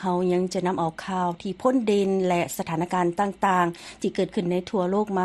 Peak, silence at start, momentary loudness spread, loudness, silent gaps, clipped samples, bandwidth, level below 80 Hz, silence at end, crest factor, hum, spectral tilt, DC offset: -8 dBFS; 0 s; 6 LU; -25 LUFS; none; under 0.1%; 12.5 kHz; -58 dBFS; 0 s; 16 dB; none; -6 dB/octave; under 0.1%